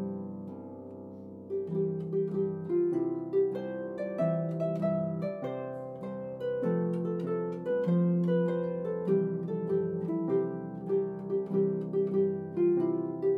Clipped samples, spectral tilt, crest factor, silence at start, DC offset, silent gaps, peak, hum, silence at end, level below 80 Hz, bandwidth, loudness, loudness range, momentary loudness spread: under 0.1%; -11 dB/octave; 14 dB; 0 s; under 0.1%; none; -18 dBFS; none; 0 s; -72 dBFS; 4.3 kHz; -31 LUFS; 3 LU; 11 LU